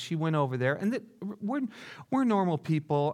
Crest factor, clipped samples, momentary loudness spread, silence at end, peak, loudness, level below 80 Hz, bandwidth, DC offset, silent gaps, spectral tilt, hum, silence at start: 16 dB; under 0.1%; 11 LU; 0 s; -14 dBFS; -30 LUFS; -78 dBFS; 12.5 kHz; under 0.1%; none; -7.5 dB/octave; none; 0 s